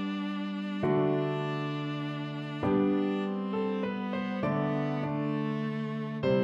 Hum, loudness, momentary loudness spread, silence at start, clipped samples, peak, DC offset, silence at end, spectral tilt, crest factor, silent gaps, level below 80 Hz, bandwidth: none; -31 LUFS; 7 LU; 0 s; under 0.1%; -16 dBFS; under 0.1%; 0 s; -8.5 dB/octave; 14 dB; none; -64 dBFS; 7.8 kHz